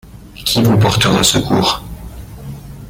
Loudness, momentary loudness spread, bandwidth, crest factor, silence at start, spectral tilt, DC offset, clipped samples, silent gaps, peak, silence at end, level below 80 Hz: -13 LUFS; 21 LU; 17 kHz; 16 dB; 0.05 s; -4 dB/octave; under 0.1%; under 0.1%; none; 0 dBFS; 0 s; -34 dBFS